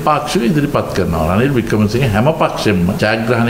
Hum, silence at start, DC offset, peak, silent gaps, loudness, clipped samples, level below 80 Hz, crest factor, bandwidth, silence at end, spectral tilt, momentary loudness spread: none; 0 s; under 0.1%; 0 dBFS; none; -14 LUFS; under 0.1%; -34 dBFS; 12 dB; 16.5 kHz; 0 s; -6.5 dB/octave; 3 LU